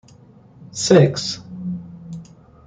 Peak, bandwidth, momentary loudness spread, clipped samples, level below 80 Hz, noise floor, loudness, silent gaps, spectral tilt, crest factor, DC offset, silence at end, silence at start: -2 dBFS; 9.6 kHz; 22 LU; under 0.1%; -56 dBFS; -47 dBFS; -18 LUFS; none; -5.5 dB/octave; 20 dB; under 0.1%; 0.45 s; 0.6 s